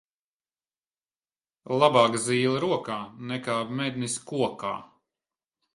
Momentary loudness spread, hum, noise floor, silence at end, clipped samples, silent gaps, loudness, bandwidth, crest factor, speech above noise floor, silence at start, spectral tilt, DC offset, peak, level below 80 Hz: 13 LU; none; under -90 dBFS; 0.9 s; under 0.1%; none; -26 LUFS; 11.5 kHz; 22 dB; over 64 dB; 1.65 s; -4.5 dB/octave; under 0.1%; -6 dBFS; -70 dBFS